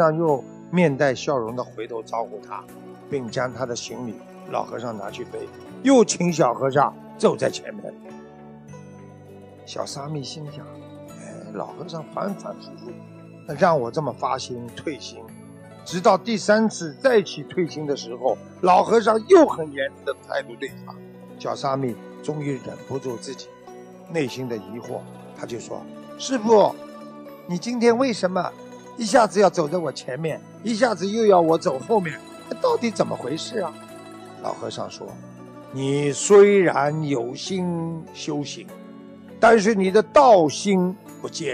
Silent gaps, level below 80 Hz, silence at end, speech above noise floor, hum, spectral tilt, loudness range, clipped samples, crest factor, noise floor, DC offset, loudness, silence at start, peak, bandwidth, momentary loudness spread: none; -64 dBFS; 0 s; 22 dB; none; -5 dB/octave; 12 LU; under 0.1%; 20 dB; -44 dBFS; under 0.1%; -22 LUFS; 0 s; -4 dBFS; 13.5 kHz; 23 LU